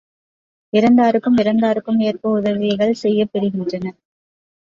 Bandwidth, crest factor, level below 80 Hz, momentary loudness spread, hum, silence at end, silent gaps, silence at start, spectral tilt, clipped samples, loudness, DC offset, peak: 7.4 kHz; 14 dB; -58 dBFS; 9 LU; none; 0.85 s; none; 0.75 s; -7.5 dB/octave; under 0.1%; -17 LUFS; under 0.1%; -4 dBFS